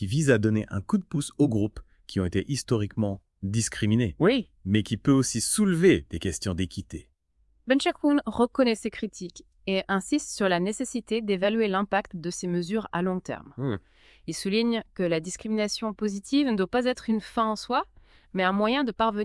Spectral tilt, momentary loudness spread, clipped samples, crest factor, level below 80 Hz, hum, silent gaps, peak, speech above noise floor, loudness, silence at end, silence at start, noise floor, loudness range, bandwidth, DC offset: -5 dB/octave; 11 LU; under 0.1%; 20 dB; -54 dBFS; none; none; -8 dBFS; 40 dB; -26 LUFS; 0 s; 0 s; -66 dBFS; 5 LU; 12 kHz; under 0.1%